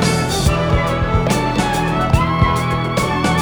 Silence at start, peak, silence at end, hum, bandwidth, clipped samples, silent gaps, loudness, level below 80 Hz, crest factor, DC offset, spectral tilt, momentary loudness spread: 0 s; 0 dBFS; 0 s; none; over 20 kHz; under 0.1%; none; -16 LUFS; -26 dBFS; 14 dB; under 0.1%; -5.5 dB/octave; 2 LU